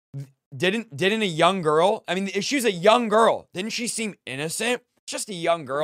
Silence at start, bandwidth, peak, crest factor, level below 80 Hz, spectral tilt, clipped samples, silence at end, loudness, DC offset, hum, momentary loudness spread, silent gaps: 0.15 s; 16 kHz; -4 dBFS; 20 dB; -70 dBFS; -3.5 dB/octave; under 0.1%; 0 s; -23 LUFS; under 0.1%; none; 12 LU; 0.46-0.51 s, 4.99-5.07 s